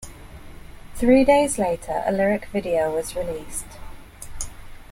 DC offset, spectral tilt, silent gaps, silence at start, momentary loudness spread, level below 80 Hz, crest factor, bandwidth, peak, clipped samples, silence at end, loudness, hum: under 0.1%; -5 dB/octave; none; 0 s; 24 LU; -40 dBFS; 18 dB; 16.5 kHz; -4 dBFS; under 0.1%; 0.05 s; -22 LUFS; none